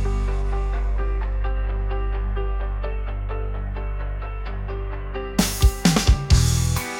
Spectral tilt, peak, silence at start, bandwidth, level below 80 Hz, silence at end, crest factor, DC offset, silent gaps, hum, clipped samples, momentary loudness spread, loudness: -5 dB/octave; -4 dBFS; 0 s; 17 kHz; -24 dBFS; 0 s; 18 dB; under 0.1%; none; 50 Hz at -45 dBFS; under 0.1%; 12 LU; -24 LUFS